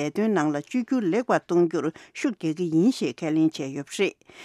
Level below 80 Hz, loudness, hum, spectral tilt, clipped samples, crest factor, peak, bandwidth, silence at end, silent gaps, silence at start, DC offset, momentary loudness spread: -78 dBFS; -25 LUFS; none; -6 dB/octave; under 0.1%; 16 dB; -8 dBFS; 12.5 kHz; 0 s; none; 0 s; under 0.1%; 8 LU